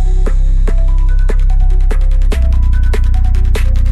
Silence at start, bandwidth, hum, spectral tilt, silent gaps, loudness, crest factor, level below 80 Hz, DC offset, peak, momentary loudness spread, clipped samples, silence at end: 0 s; 4.6 kHz; none; -7 dB/octave; none; -15 LUFS; 6 dB; -8 dBFS; under 0.1%; -2 dBFS; 2 LU; under 0.1%; 0 s